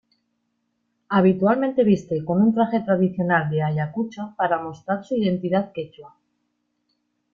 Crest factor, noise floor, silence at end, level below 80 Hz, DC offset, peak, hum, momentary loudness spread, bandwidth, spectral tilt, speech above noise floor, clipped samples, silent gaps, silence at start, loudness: 16 dB; -73 dBFS; 1.25 s; -62 dBFS; under 0.1%; -6 dBFS; none; 10 LU; 7 kHz; -8.5 dB/octave; 52 dB; under 0.1%; none; 1.1 s; -22 LUFS